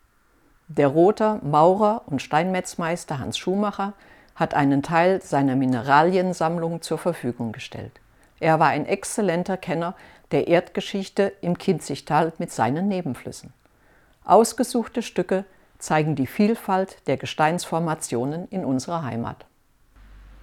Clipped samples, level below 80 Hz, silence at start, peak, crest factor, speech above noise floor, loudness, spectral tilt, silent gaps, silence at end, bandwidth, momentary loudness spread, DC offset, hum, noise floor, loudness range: under 0.1%; -56 dBFS; 0.7 s; -2 dBFS; 20 dB; 38 dB; -23 LUFS; -5.5 dB/octave; none; 0.15 s; 17 kHz; 12 LU; under 0.1%; none; -60 dBFS; 4 LU